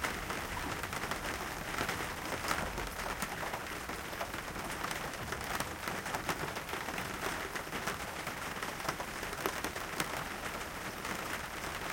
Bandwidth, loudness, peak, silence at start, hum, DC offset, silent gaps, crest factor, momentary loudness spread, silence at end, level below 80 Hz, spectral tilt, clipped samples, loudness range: 17 kHz; -38 LUFS; -12 dBFS; 0 s; none; under 0.1%; none; 26 dB; 3 LU; 0 s; -52 dBFS; -3 dB/octave; under 0.1%; 1 LU